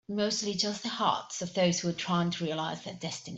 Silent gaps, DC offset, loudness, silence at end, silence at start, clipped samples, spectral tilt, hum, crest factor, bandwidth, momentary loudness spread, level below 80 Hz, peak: none; under 0.1%; -31 LUFS; 0 s; 0.1 s; under 0.1%; -4 dB/octave; none; 18 dB; 8.2 kHz; 8 LU; -70 dBFS; -14 dBFS